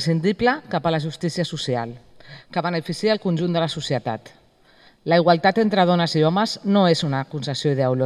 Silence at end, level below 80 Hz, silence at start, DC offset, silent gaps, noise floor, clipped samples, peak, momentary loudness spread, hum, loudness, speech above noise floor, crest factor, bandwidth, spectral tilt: 0 s; -56 dBFS; 0 s; under 0.1%; none; -54 dBFS; under 0.1%; -2 dBFS; 9 LU; none; -21 LUFS; 33 dB; 18 dB; 12 kHz; -6 dB/octave